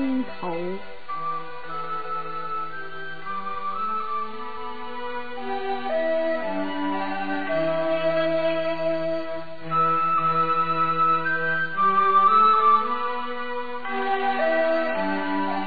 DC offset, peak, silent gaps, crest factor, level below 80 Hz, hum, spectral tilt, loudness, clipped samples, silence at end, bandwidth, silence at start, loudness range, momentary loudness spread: 3%; -8 dBFS; none; 16 dB; -66 dBFS; none; -8 dB/octave; -24 LUFS; under 0.1%; 0 s; 4.9 kHz; 0 s; 11 LU; 14 LU